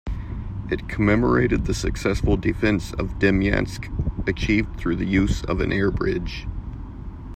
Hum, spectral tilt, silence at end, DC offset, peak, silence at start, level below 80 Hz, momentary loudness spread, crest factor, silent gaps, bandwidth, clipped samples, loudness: none; -6.5 dB/octave; 0 s; under 0.1%; -4 dBFS; 0.05 s; -30 dBFS; 13 LU; 18 dB; none; 15 kHz; under 0.1%; -23 LUFS